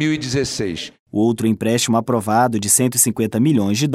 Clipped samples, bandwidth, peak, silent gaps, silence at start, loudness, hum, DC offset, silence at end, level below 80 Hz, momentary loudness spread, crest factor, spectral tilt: under 0.1%; 16 kHz; 0 dBFS; 0.99-1.06 s; 0 s; -17 LUFS; none; under 0.1%; 0 s; -50 dBFS; 8 LU; 16 dB; -4 dB/octave